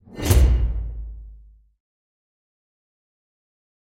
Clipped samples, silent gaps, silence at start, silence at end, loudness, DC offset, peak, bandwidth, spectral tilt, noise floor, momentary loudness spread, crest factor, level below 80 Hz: under 0.1%; none; 0.1 s; 2.65 s; -21 LUFS; under 0.1%; -2 dBFS; 16 kHz; -5.5 dB/octave; -47 dBFS; 21 LU; 22 dB; -26 dBFS